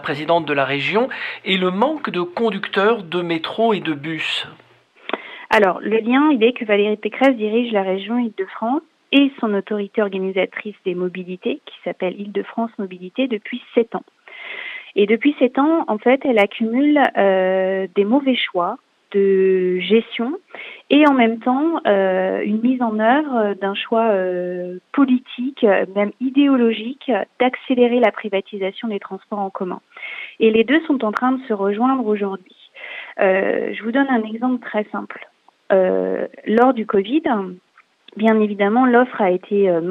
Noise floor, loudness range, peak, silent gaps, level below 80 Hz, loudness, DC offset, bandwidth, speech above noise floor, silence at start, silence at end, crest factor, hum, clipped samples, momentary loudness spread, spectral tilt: -50 dBFS; 4 LU; -2 dBFS; none; -70 dBFS; -19 LUFS; under 0.1%; 8.6 kHz; 32 dB; 0 s; 0 s; 16 dB; none; under 0.1%; 12 LU; -7 dB/octave